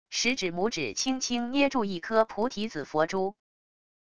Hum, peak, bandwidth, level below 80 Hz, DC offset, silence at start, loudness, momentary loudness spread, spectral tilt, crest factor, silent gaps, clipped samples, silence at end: none; -10 dBFS; 11 kHz; -62 dBFS; 0.4%; 0.05 s; -28 LUFS; 5 LU; -3 dB/octave; 20 dB; none; under 0.1%; 0.7 s